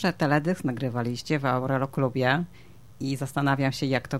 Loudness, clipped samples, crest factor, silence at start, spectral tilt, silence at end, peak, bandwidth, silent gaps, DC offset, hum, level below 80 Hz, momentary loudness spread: -27 LUFS; under 0.1%; 18 dB; 0 s; -6.5 dB/octave; 0 s; -8 dBFS; 15 kHz; none; 0.3%; none; -58 dBFS; 7 LU